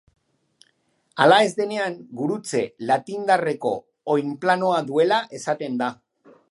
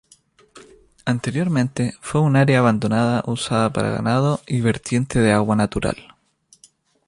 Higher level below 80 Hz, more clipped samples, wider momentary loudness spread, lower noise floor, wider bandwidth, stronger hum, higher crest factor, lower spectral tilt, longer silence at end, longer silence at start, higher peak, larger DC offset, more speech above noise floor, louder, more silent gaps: second, -74 dBFS vs -46 dBFS; neither; first, 11 LU vs 8 LU; first, -66 dBFS vs -57 dBFS; about the same, 11.5 kHz vs 11.5 kHz; neither; first, 22 dB vs 16 dB; second, -4.5 dB/octave vs -6.5 dB/octave; second, 0.55 s vs 1.05 s; first, 1.15 s vs 0.55 s; about the same, -2 dBFS vs -4 dBFS; neither; first, 45 dB vs 39 dB; about the same, -22 LUFS vs -20 LUFS; neither